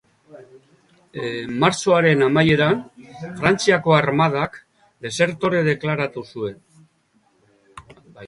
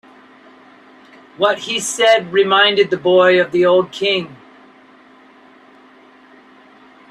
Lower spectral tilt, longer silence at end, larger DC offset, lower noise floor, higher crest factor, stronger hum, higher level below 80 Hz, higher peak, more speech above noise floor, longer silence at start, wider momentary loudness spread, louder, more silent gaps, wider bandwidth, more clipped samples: first, -5.5 dB/octave vs -3 dB/octave; second, 0 s vs 2.75 s; neither; first, -62 dBFS vs -46 dBFS; about the same, 20 dB vs 18 dB; neither; first, -54 dBFS vs -64 dBFS; about the same, -2 dBFS vs 0 dBFS; first, 43 dB vs 32 dB; second, 0.35 s vs 1.4 s; first, 15 LU vs 8 LU; second, -19 LUFS vs -14 LUFS; neither; second, 11.5 kHz vs 13 kHz; neither